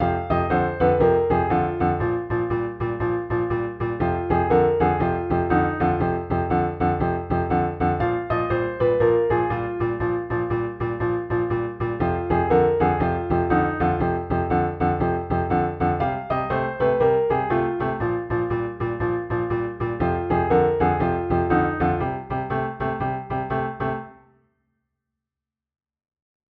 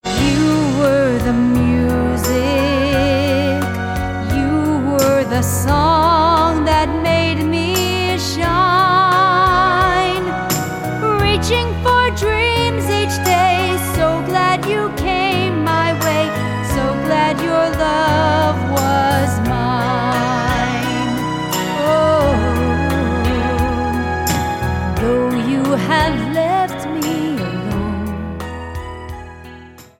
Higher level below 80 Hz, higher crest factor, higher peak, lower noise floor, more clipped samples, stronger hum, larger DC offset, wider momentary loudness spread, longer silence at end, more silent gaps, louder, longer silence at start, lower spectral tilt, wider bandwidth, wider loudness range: second, -40 dBFS vs -30 dBFS; about the same, 16 dB vs 14 dB; second, -6 dBFS vs -2 dBFS; first, -88 dBFS vs -38 dBFS; neither; neither; neither; about the same, 7 LU vs 7 LU; first, 2.4 s vs 0.15 s; neither; second, -23 LUFS vs -16 LUFS; about the same, 0 s vs 0.05 s; first, -10.5 dB/octave vs -5 dB/octave; second, 4.7 kHz vs 17 kHz; about the same, 3 LU vs 3 LU